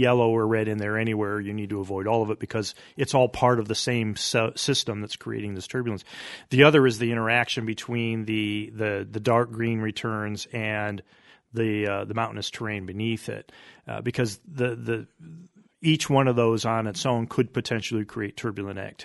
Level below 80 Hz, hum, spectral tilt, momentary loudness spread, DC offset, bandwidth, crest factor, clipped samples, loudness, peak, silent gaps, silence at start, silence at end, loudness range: -60 dBFS; none; -5 dB/octave; 11 LU; under 0.1%; 11.5 kHz; 24 dB; under 0.1%; -26 LUFS; 0 dBFS; none; 0 s; 0 s; 7 LU